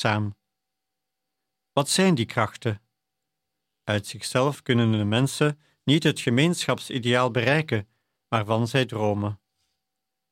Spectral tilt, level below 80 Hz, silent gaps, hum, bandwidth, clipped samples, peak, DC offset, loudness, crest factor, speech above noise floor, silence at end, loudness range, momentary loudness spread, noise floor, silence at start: -5 dB/octave; -64 dBFS; none; none; 16 kHz; under 0.1%; -6 dBFS; under 0.1%; -24 LUFS; 20 dB; 61 dB; 0.95 s; 4 LU; 9 LU; -84 dBFS; 0 s